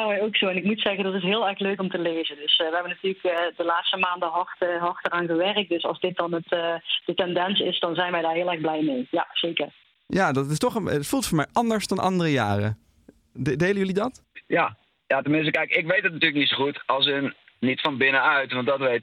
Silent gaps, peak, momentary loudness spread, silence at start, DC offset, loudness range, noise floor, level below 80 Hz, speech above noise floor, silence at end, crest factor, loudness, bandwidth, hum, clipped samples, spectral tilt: none; -8 dBFS; 6 LU; 0 s; under 0.1%; 3 LU; -56 dBFS; -60 dBFS; 32 dB; 0 s; 18 dB; -24 LUFS; 16 kHz; none; under 0.1%; -4.5 dB/octave